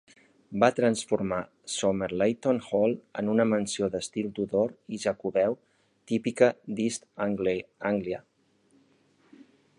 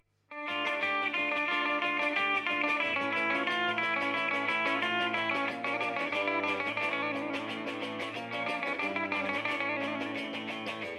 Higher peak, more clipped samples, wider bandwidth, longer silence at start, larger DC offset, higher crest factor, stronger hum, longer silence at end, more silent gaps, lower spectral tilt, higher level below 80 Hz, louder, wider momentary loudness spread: first, -6 dBFS vs -16 dBFS; neither; second, 11.5 kHz vs 13.5 kHz; first, 0.5 s vs 0.3 s; neither; first, 22 dB vs 16 dB; neither; first, 1.6 s vs 0 s; neither; about the same, -5 dB/octave vs -4 dB/octave; first, -64 dBFS vs -82 dBFS; first, -28 LUFS vs -31 LUFS; about the same, 8 LU vs 7 LU